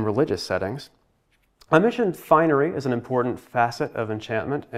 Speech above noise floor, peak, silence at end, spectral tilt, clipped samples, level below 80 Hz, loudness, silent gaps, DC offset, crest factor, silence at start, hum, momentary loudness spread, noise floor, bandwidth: 43 dB; -2 dBFS; 0 s; -6.5 dB/octave; under 0.1%; -60 dBFS; -23 LUFS; none; under 0.1%; 22 dB; 0 s; none; 9 LU; -66 dBFS; 15 kHz